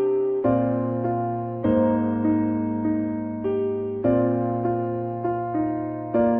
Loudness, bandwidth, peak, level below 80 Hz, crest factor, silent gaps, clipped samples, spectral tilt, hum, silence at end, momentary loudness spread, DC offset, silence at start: -24 LUFS; 3.4 kHz; -8 dBFS; -52 dBFS; 14 dB; none; under 0.1%; -13 dB/octave; none; 0 s; 6 LU; under 0.1%; 0 s